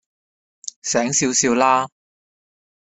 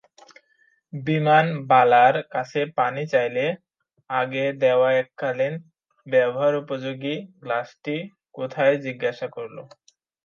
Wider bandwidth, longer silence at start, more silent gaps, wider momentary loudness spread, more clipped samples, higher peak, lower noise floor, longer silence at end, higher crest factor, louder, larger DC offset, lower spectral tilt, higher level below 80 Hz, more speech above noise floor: first, 8.4 kHz vs 7 kHz; second, 0.65 s vs 0.95 s; first, 0.76-0.82 s vs none; about the same, 16 LU vs 15 LU; neither; about the same, -2 dBFS vs -4 dBFS; first, under -90 dBFS vs -64 dBFS; first, 1 s vs 0.6 s; about the same, 20 dB vs 18 dB; first, -18 LUFS vs -22 LUFS; neither; second, -2.5 dB/octave vs -7 dB/octave; first, -60 dBFS vs -76 dBFS; first, over 72 dB vs 42 dB